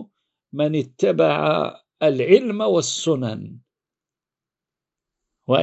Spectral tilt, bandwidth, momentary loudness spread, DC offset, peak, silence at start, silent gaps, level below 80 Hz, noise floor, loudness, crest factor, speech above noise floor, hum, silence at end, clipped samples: -5 dB/octave; 8.2 kHz; 16 LU; under 0.1%; 0 dBFS; 0 s; none; -68 dBFS; -89 dBFS; -20 LUFS; 22 dB; 70 dB; none; 0 s; under 0.1%